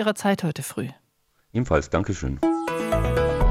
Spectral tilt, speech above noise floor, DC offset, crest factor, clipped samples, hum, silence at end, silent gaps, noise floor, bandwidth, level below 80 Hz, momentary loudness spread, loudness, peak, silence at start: -6 dB/octave; 43 dB; under 0.1%; 16 dB; under 0.1%; none; 0 s; none; -67 dBFS; 16 kHz; -32 dBFS; 9 LU; -25 LUFS; -8 dBFS; 0 s